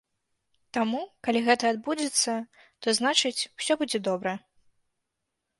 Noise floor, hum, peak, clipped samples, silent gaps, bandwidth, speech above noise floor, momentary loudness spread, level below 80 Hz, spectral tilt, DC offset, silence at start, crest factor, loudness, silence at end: -82 dBFS; none; -8 dBFS; under 0.1%; none; 11.5 kHz; 56 dB; 11 LU; -72 dBFS; -2 dB/octave; under 0.1%; 0.75 s; 22 dB; -27 LUFS; 1.2 s